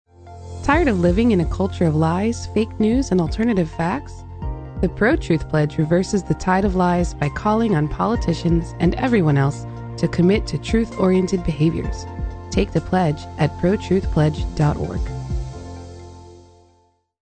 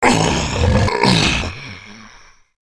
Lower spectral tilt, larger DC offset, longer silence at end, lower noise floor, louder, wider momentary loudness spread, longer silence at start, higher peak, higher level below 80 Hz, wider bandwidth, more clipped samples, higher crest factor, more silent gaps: first, -7 dB/octave vs -4.5 dB/octave; neither; first, 0.85 s vs 0.6 s; first, -60 dBFS vs -45 dBFS; second, -20 LUFS vs -16 LUFS; second, 13 LU vs 19 LU; first, 0.2 s vs 0 s; second, -4 dBFS vs 0 dBFS; about the same, -32 dBFS vs -28 dBFS; second, 9 kHz vs 11 kHz; neither; about the same, 16 dB vs 18 dB; neither